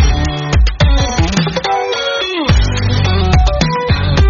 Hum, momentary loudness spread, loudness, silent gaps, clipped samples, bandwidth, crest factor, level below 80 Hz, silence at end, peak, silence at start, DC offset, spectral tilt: none; 3 LU; -14 LUFS; none; under 0.1%; 7.4 kHz; 12 dB; -16 dBFS; 0 s; 0 dBFS; 0 s; under 0.1%; -4.5 dB/octave